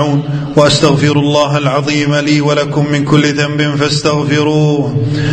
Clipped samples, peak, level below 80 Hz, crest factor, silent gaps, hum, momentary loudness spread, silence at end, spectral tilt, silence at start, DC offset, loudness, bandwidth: 0.3%; 0 dBFS; -40 dBFS; 10 dB; none; none; 4 LU; 0 s; -5.5 dB/octave; 0 s; under 0.1%; -11 LUFS; 9.2 kHz